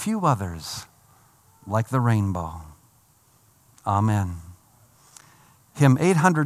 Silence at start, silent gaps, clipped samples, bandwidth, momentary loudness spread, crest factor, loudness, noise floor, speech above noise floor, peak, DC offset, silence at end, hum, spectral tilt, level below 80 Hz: 0 s; none; under 0.1%; 15 kHz; 17 LU; 20 dB; -23 LUFS; -59 dBFS; 38 dB; -4 dBFS; under 0.1%; 0 s; none; -6.5 dB/octave; -56 dBFS